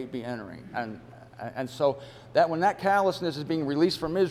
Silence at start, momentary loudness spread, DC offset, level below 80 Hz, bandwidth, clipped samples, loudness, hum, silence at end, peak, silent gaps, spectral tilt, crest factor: 0 s; 14 LU; under 0.1%; -60 dBFS; 14.5 kHz; under 0.1%; -27 LUFS; none; 0 s; -10 dBFS; none; -6 dB/octave; 18 dB